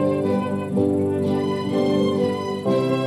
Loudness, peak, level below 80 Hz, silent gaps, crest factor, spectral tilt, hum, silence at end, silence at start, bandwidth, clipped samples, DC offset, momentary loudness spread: -22 LUFS; -6 dBFS; -64 dBFS; none; 14 dB; -7.5 dB/octave; none; 0 s; 0 s; 12.5 kHz; under 0.1%; under 0.1%; 3 LU